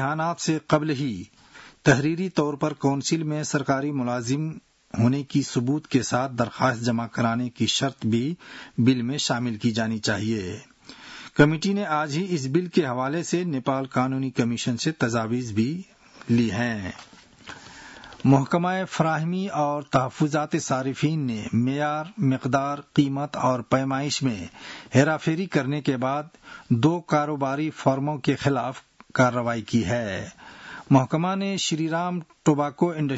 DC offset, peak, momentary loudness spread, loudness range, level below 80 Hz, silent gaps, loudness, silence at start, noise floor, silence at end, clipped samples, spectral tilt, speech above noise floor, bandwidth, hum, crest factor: under 0.1%; -4 dBFS; 12 LU; 2 LU; -60 dBFS; none; -24 LUFS; 0 s; -45 dBFS; 0 s; under 0.1%; -5.5 dB/octave; 21 dB; 8 kHz; none; 20 dB